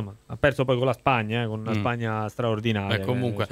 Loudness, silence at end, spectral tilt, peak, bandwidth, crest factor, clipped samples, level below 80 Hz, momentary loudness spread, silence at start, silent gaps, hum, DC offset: -25 LUFS; 0 s; -7 dB/octave; -6 dBFS; 14.5 kHz; 18 dB; under 0.1%; -52 dBFS; 5 LU; 0 s; none; none; under 0.1%